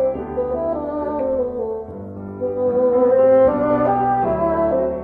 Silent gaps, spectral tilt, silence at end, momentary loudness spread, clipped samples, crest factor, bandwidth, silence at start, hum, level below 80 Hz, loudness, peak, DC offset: none; -10.5 dB/octave; 0 s; 13 LU; under 0.1%; 14 dB; 3.3 kHz; 0 s; none; -42 dBFS; -18 LUFS; -4 dBFS; under 0.1%